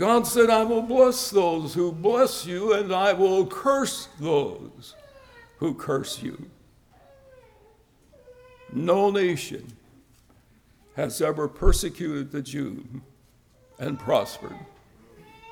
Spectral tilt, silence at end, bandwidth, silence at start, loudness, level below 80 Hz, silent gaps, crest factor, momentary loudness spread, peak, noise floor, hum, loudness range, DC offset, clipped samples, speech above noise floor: -4.5 dB/octave; 0 s; 19.5 kHz; 0 s; -24 LUFS; -38 dBFS; none; 20 dB; 20 LU; -6 dBFS; -59 dBFS; none; 12 LU; under 0.1%; under 0.1%; 35 dB